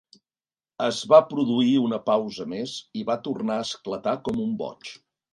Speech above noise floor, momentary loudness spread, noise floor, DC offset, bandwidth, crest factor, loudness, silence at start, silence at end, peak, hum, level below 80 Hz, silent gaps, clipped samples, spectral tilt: over 66 dB; 14 LU; under -90 dBFS; under 0.1%; 11.5 kHz; 22 dB; -24 LUFS; 0.8 s; 0.4 s; -2 dBFS; none; -64 dBFS; none; under 0.1%; -5.5 dB/octave